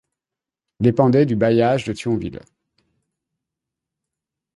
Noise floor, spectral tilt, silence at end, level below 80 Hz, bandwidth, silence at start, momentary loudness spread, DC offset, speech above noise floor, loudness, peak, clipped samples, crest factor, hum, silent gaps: -88 dBFS; -8 dB/octave; 2.15 s; -52 dBFS; 11.5 kHz; 0.8 s; 9 LU; under 0.1%; 70 dB; -18 LUFS; -2 dBFS; under 0.1%; 20 dB; none; none